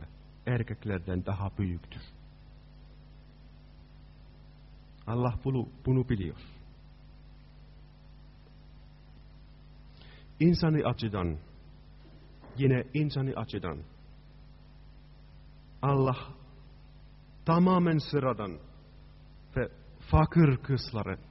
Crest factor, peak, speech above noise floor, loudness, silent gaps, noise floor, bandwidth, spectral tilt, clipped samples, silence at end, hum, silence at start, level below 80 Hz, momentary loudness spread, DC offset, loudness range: 22 dB; -10 dBFS; 24 dB; -30 LUFS; none; -53 dBFS; 5.8 kHz; -7 dB/octave; under 0.1%; 0 s; none; 0 s; -48 dBFS; 23 LU; under 0.1%; 10 LU